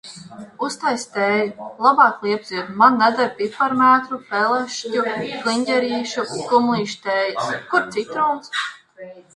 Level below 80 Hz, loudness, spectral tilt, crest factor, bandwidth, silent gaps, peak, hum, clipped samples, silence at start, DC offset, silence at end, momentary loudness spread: -66 dBFS; -19 LUFS; -4 dB/octave; 20 dB; 11.5 kHz; none; 0 dBFS; none; under 0.1%; 0.05 s; under 0.1%; 0.15 s; 11 LU